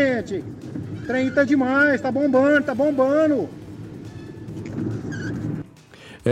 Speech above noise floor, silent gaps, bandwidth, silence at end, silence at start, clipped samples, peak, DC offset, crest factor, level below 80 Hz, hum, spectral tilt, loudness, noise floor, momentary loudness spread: 25 dB; none; 10 kHz; 0 s; 0 s; under 0.1%; -8 dBFS; under 0.1%; 14 dB; -54 dBFS; none; -7 dB/octave; -21 LUFS; -45 dBFS; 19 LU